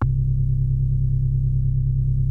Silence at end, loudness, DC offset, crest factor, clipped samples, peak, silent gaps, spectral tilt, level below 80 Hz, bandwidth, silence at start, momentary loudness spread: 0 s; -22 LUFS; under 0.1%; 10 dB; under 0.1%; -8 dBFS; none; -12 dB/octave; -26 dBFS; 1.7 kHz; 0 s; 0 LU